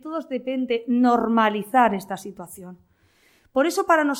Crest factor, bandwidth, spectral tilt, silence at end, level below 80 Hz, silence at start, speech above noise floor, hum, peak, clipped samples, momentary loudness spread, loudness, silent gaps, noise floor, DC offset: 18 dB; 16.5 kHz; -5 dB/octave; 0 s; -64 dBFS; 0.05 s; 38 dB; none; -6 dBFS; under 0.1%; 18 LU; -22 LUFS; none; -60 dBFS; under 0.1%